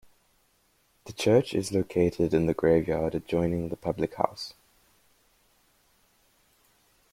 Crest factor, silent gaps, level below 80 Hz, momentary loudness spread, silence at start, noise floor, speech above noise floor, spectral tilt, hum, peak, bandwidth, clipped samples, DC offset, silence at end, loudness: 24 dB; none; -54 dBFS; 8 LU; 1.05 s; -68 dBFS; 42 dB; -6.5 dB/octave; none; -4 dBFS; 16 kHz; under 0.1%; under 0.1%; 2.6 s; -27 LUFS